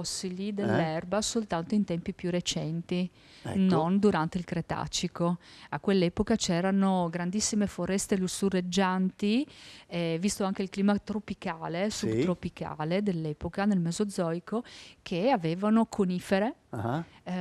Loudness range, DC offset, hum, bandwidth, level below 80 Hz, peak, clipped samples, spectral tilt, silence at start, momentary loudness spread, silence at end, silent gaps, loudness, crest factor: 3 LU; under 0.1%; none; 13.5 kHz; -56 dBFS; -14 dBFS; under 0.1%; -5.5 dB/octave; 0 s; 9 LU; 0 s; none; -30 LUFS; 16 dB